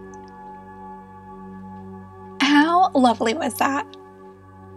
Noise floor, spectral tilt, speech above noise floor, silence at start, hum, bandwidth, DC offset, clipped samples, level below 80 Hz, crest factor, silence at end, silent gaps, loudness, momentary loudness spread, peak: -44 dBFS; -4 dB/octave; 23 dB; 0 s; none; 13 kHz; under 0.1%; under 0.1%; -60 dBFS; 20 dB; 0 s; none; -19 LUFS; 24 LU; -2 dBFS